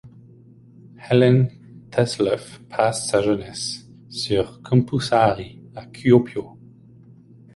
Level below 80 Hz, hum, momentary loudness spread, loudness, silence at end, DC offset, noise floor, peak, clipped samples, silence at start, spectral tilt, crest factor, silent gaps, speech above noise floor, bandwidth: -52 dBFS; none; 15 LU; -21 LUFS; 1.05 s; under 0.1%; -48 dBFS; -2 dBFS; under 0.1%; 0.05 s; -6 dB/octave; 20 dB; none; 28 dB; 11.5 kHz